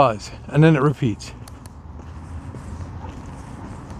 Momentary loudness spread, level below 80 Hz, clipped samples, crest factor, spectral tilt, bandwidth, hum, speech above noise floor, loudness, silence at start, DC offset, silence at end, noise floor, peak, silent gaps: 23 LU; -42 dBFS; under 0.1%; 20 dB; -7.5 dB/octave; 10.5 kHz; none; 20 dB; -19 LUFS; 0 s; under 0.1%; 0 s; -38 dBFS; -2 dBFS; none